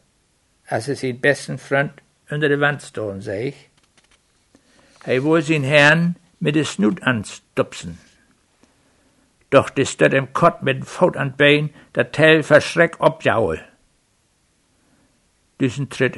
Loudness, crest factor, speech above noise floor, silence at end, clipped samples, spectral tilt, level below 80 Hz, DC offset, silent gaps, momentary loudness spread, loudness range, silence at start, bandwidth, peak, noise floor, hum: -18 LUFS; 20 dB; 45 dB; 0 s; under 0.1%; -5.5 dB/octave; -56 dBFS; under 0.1%; none; 13 LU; 8 LU; 0.7 s; 11.5 kHz; 0 dBFS; -63 dBFS; none